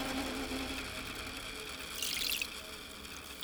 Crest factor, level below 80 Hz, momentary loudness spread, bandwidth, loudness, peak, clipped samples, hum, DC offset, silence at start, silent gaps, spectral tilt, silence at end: 22 dB; -54 dBFS; 12 LU; over 20 kHz; -38 LUFS; -18 dBFS; under 0.1%; none; under 0.1%; 0 s; none; -2 dB/octave; 0 s